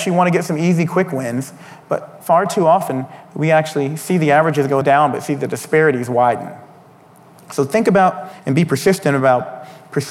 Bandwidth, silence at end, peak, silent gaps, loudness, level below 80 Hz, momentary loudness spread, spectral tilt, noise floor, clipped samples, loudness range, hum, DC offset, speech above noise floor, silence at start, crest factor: 16 kHz; 0 s; -2 dBFS; none; -16 LUFS; -62 dBFS; 11 LU; -6 dB/octave; -45 dBFS; under 0.1%; 2 LU; none; under 0.1%; 29 dB; 0 s; 14 dB